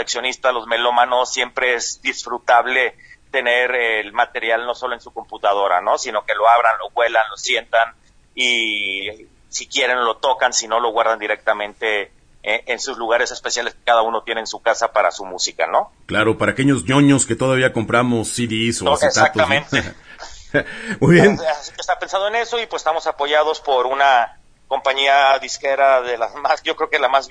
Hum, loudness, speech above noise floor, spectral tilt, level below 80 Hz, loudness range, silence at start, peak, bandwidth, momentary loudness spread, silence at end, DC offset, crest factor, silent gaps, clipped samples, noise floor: none; -18 LUFS; 19 dB; -3.5 dB/octave; -50 dBFS; 3 LU; 0 s; 0 dBFS; 10.5 kHz; 9 LU; 0 s; under 0.1%; 18 dB; none; under 0.1%; -37 dBFS